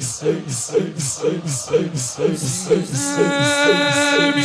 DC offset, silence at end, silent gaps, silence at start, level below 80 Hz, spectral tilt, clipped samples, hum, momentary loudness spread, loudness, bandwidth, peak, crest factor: under 0.1%; 0 s; none; 0 s; -56 dBFS; -3.5 dB/octave; under 0.1%; none; 7 LU; -18 LUFS; 11 kHz; -2 dBFS; 16 dB